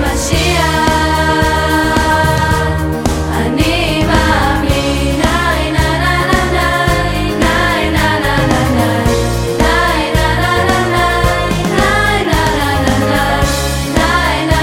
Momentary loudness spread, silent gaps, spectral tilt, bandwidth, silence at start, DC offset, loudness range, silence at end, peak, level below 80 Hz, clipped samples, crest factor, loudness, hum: 3 LU; none; -5 dB/octave; 17 kHz; 0 s; under 0.1%; 1 LU; 0 s; 0 dBFS; -20 dBFS; under 0.1%; 12 dB; -12 LUFS; none